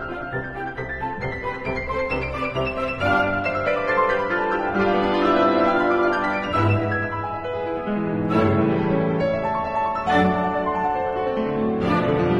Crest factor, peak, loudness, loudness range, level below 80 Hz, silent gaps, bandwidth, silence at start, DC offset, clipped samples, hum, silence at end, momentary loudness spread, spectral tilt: 16 dB; -6 dBFS; -22 LUFS; 4 LU; -42 dBFS; none; 9.2 kHz; 0 s; under 0.1%; under 0.1%; none; 0 s; 9 LU; -7.5 dB/octave